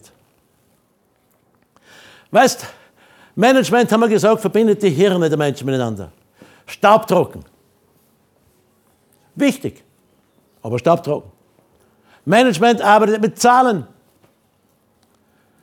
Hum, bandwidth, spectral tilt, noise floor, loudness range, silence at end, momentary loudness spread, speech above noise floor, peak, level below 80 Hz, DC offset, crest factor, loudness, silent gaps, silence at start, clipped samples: none; 19 kHz; -5 dB/octave; -61 dBFS; 7 LU; 1.8 s; 16 LU; 46 dB; 0 dBFS; -62 dBFS; under 0.1%; 18 dB; -15 LUFS; none; 2.3 s; under 0.1%